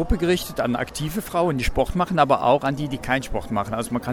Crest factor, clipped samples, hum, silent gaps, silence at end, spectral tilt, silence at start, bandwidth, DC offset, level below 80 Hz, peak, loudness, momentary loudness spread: 20 dB; under 0.1%; none; none; 0 s; -5.5 dB/octave; 0 s; 19 kHz; under 0.1%; -34 dBFS; -4 dBFS; -23 LUFS; 8 LU